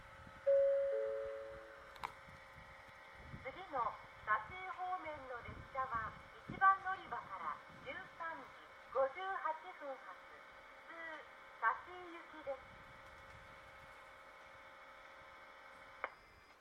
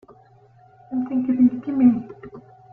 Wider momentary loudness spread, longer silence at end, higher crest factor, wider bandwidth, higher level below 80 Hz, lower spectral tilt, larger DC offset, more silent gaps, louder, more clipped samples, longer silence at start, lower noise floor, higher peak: about the same, 21 LU vs 22 LU; second, 0.1 s vs 0.35 s; first, 24 dB vs 16 dB; first, 11 kHz vs 2.9 kHz; second, -70 dBFS vs -60 dBFS; second, -5 dB/octave vs -11 dB/octave; neither; neither; second, -42 LUFS vs -20 LUFS; neither; second, 0 s vs 0.9 s; first, -62 dBFS vs -52 dBFS; second, -20 dBFS vs -6 dBFS